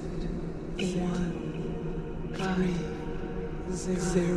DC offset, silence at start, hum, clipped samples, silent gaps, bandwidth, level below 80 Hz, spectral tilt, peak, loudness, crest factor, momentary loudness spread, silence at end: under 0.1%; 0 s; none; under 0.1%; none; 11.5 kHz; -40 dBFS; -6 dB/octave; -14 dBFS; -33 LUFS; 16 dB; 8 LU; 0 s